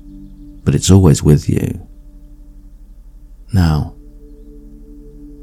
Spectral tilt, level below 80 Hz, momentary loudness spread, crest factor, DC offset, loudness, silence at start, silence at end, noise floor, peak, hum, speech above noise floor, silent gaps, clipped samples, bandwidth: -6.5 dB/octave; -30 dBFS; 17 LU; 16 dB; under 0.1%; -14 LUFS; 0.05 s; 0 s; -37 dBFS; 0 dBFS; none; 26 dB; none; 0.3%; 14 kHz